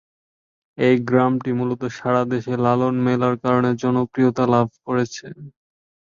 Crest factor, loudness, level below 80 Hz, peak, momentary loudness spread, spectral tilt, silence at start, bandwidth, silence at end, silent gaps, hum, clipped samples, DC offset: 18 dB; -20 LUFS; -58 dBFS; -4 dBFS; 6 LU; -7.5 dB/octave; 0.8 s; 7.2 kHz; 0.65 s; none; none; under 0.1%; under 0.1%